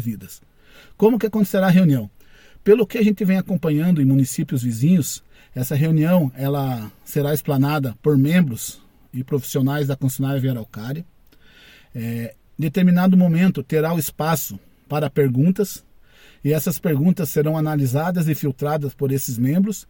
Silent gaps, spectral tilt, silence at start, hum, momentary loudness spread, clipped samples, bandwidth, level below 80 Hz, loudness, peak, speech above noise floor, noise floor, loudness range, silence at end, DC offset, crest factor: none; -7 dB/octave; 0 s; none; 14 LU; under 0.1%; 17 kHz; -54 dBFS; -20 LUFS; -2 dBFS; 30 dB; -49 dBFS; 5 LU; 0.1 s; under 0.1%; 18 dB